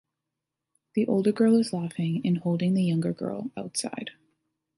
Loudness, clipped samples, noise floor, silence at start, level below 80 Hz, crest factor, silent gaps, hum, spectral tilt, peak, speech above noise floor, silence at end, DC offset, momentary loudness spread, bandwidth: -26 LUFS; under 0.1%; -86 dBFS; 0.95 s; -70 dBFS; 16 dB; none; none; -6.5 dB/octave; -12 dBFS; 60 dB; 0.65 s; under 0.1%; 12 LU; 11.5 kHz